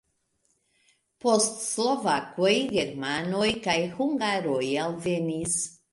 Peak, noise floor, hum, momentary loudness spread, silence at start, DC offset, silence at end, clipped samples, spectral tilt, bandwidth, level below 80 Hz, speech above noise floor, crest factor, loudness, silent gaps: -8 dBFS; -72 dBFS; none; 5 LU; 1.25 s; under 0.1%; 0.2 s; under 0.1%; -3.5 dB/octave; 11.5 kHz; -62 dBFS; 46 dB; 18 dB; -26 LUFS; none